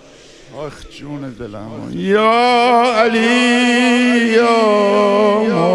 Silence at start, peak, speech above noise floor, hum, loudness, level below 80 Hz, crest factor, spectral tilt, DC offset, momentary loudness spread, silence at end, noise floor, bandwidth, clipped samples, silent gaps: 0.5 s; 0 dBFS; 27 dB; none; -12 LUFS; -50 dBFS; 14 dB; -4.5 dB/octave; under 0.1%; 18 LU; 0 s; -41 dBFS; 11.5 kHz; under 0.1%; none